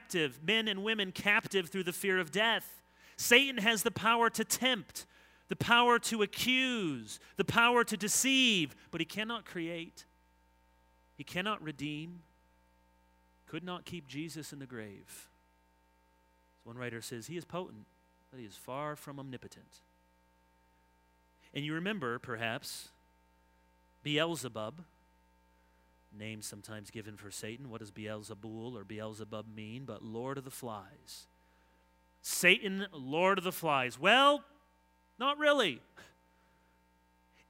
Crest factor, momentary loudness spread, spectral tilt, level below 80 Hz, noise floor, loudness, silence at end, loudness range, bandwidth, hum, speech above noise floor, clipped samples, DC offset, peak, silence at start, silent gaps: 28 dB; 21 LU; -3 dB/octave; -72 dBFS; -70 dBFS; -32 LUFS; 1.45 s; 17 LU; 16 kHz; none; 36 dB; under 0.1%; under 0.1%; -8 dBFS; 0 s; none